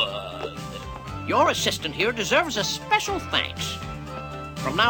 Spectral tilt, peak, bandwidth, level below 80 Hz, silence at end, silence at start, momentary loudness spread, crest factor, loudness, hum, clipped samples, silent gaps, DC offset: -3 dB/octave; -6 dBFS; 18 kHz; -46 dBFS; 0 s; 0 s; 14 LU; 20 dB; -25 LUFS; none; under 0.1%; none; under 0.1%